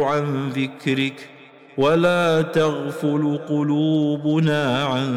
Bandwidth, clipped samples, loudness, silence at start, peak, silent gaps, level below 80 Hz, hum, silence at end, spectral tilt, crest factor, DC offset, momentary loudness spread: 13 kHz; under 0.1%; -20 LUFS; 0 s; -8 dBFS; none; -60 dBFS; none; 0 s; -6.5 dB/octave; 12 dB; under 0.1%; 7 LU